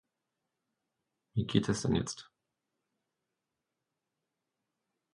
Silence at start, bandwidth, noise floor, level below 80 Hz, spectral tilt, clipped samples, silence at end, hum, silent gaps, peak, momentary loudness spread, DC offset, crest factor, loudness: 1.35 s; 11 kHz; -87 dBFS; -58 dBFS; -5.5 dB/octave; under 0.1%; 2.9 s; none; none; -12 dBFS; 10 LU; under 0.1%; 26 dB; -33 LUFS